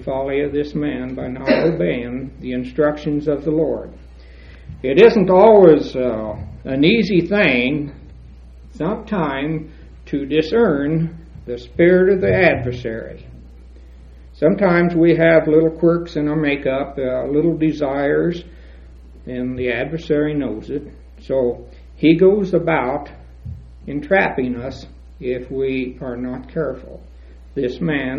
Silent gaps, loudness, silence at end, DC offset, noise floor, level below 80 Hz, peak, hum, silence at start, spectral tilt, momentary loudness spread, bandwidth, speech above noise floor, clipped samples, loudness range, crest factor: none; -17 LUFS; 0 s; under 0.1%; -40 dBFS; -40 dBFS; 0 dBFS; none; 0 s; -8.5 dB/octave; 17 LU; 6.8 kHz; 23 dB; under 0.1%; 8 LU; 18 dB